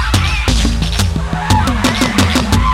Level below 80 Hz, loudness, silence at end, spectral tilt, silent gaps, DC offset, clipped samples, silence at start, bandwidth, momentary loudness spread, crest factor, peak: -18 dBFS; -14 LUFS; 0 s; -4.5 dB/octave; none; under 0.1%; under 0.1%; 0 s; 16.5 kHz; 4 LU; 12 dB; 0 dBFS